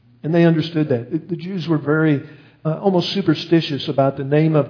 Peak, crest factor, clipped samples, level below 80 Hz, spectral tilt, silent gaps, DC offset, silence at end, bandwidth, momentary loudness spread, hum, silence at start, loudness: -2 dBFS; 16 dB; under 0.1%; -64 dBFS; -8 dB/octave; none; under 0.1%; 0 s; 5.4 kHz; 9 LU; none; 0.25 s; -19 LUFS